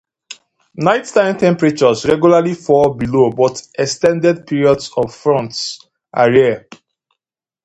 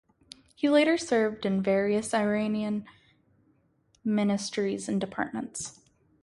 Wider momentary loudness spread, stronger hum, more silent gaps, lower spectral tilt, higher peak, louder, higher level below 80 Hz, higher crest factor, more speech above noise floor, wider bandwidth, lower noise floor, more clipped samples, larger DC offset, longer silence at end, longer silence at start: about the same, 13 LU vs 12 LU; neither; neither; about the same, -5.5 dB/octave vs -5 dB/octave; first, 0 dBFS vs -10 dBFS; first, -14 LUFS vs -28 LUFS; first, -50 dBFS vs -66 dBFS; about the same, 14 dB vs 18 dB; first, 69 dB vs 41 dB; second, 9 kHz vs 11.5 kHz; first, -83 dBFS vs -68 dBFS; neither; neither; first, 1.05 s vs 0.5 s; second, 0.3 s vs 0.6 s